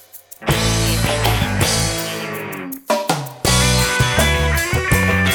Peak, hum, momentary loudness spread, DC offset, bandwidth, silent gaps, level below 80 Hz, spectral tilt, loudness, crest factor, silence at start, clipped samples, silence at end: 0 dBFS; none; 10 LU; under 0.1%; over 20 kHz; none; -28 dBFS; -3.5 dB/octave; -17 LUFS; 16 dB; 0.15 s; under 0.1%; 0 s